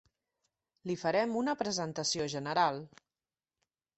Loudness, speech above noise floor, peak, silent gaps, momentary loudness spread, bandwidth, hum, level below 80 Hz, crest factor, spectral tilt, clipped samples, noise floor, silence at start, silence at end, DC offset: -33 LUFS; over 57 dB; -14 dBFS; none; 8 LU; 8.2 kHz; none; -74 dBFS; 22 dB; -3.5 dB/octave; under 0.1%; under -90 dBFS; 0.85 s; 1.1 s; under 0.1%